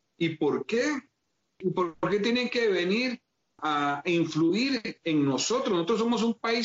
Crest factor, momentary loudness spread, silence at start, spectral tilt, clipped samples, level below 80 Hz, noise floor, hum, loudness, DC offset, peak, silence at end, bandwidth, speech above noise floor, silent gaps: 12 dB; 6 LU; 0.2 s; -3.5 dB/octave; under 0.1%; -68 dBFS; -78 dBFS; none; -27 LUFS; under 0.1%; -16 dBFS; 0 s; 8 kHz; 51 dB; none